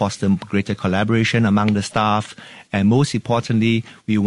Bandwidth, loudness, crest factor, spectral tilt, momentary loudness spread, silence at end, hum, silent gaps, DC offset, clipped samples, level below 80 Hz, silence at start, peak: 11.5 kHz; -19 LUFS; 14 dB; -6 dB/octave; 6 LU; 0 s; none; none; under 0.1%; under 0.1%; -52 dBFS; 0 s; -4 dBFS